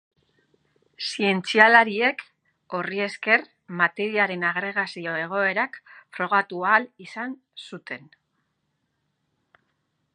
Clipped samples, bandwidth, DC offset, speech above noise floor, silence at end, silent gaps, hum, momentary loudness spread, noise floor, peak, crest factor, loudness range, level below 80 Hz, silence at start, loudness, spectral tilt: under 0.1%; 11 kHz; under 0.1%; 51 dB; 2.2 s; none; none; 20 LU; -75 dBFS; 0 dBFS; 24 dB; 8 LU; -80 dBFS; 1 s; -22 LUFS; -4.5 dB/octave